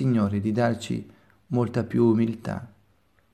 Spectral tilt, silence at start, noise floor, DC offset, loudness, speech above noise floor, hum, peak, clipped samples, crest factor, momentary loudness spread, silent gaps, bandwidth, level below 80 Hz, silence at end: -8 dB/octave; 0 s; -65 dBFS; under 0.1%; -25 LUFS; 41 dB; none; -8 dBFS; under 0.1%; 16 dB; 12 LU; none; 11.5 kHz; -60 dBFS; 0.65 s